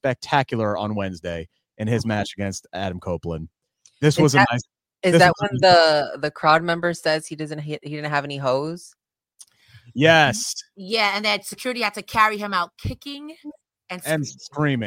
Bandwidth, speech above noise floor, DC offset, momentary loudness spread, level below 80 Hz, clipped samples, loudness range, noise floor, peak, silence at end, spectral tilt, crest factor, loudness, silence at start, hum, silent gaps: 16.5 kHz; 32 dB; under 0.1%; 16 LU; -52 dBFS; under 0.1%; 8 LU; -53 dBFS; -2 dBFS; 0 s; -4.5 dB/octave; 20 dB; -21 LUFS; 0.05 s; none; none